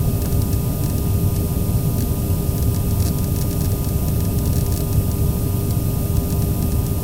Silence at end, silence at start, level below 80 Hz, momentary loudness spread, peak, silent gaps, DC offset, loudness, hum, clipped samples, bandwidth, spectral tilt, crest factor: 0 s; 0 s; -26 dBFS; 1 LU; -6 dBFS; none; under 0.1%; -20 LUFS; none; under 0.1%; 19 kHz; -6.5 dB/octave; 12 dB